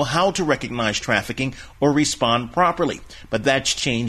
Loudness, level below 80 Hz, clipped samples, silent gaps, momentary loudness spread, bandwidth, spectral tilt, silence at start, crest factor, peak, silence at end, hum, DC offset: -21 LUFS; -44 dBFS; under 0.1%; none; 8 LU; 14 kHz; -4 dB/octave; 0 s; 18 dB; -4 dBFS; 0 s; none; under 0.1%